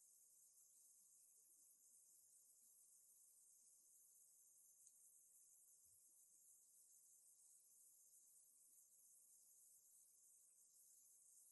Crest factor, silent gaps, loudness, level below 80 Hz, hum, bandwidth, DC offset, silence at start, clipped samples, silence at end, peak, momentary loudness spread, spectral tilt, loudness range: 24 dB; none; -69 LUFS; under -90 dBFS; none; 12 kHz; under 0.1%; 0 s; under 0.1%; 0 s; -48 dBFS; 1 LU; 1.5 dB/octave; 0 LU